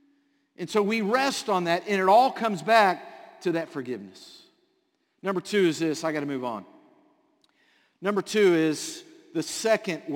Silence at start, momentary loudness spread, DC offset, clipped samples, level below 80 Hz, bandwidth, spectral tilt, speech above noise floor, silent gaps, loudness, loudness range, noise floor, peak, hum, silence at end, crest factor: 0.6 s; 15 LU; under 0.1%; under 0.1%; -76 dBFS; 17 kHz; -4.5 dB/octave; 48 dB; none; -25 LUFS; 6 LU; -72 dBFS; -6 dBFS; none; 0 s; 22 dB